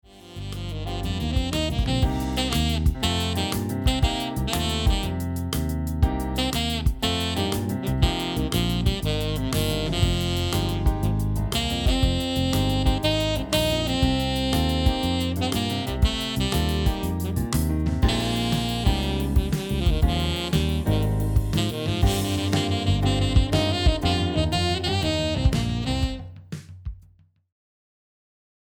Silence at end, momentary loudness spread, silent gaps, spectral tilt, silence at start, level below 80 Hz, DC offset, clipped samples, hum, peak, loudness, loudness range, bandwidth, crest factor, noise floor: 1.7 s; 5 LU; none; -5.5 dB/octave; 0.15 s; -30 dBFS; under 0.1%; under 0.1%; none; -6 dBFS; -24 LUFS; 2 LU; over 20 kHz; 18 dB; -56 dBFS